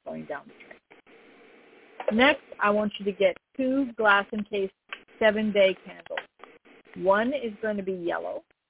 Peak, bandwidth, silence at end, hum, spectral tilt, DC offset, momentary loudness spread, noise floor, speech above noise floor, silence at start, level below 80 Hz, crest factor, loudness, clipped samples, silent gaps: -6 dBFS; 4 kHz; 0.3 s; none; -8.5 dB/octave; under 0.1%; 15 LU; -55 dBFS; 30 dB; 0.05 s; -64 dBFS; 20 dB; -26 LUFS; under 0.1%; none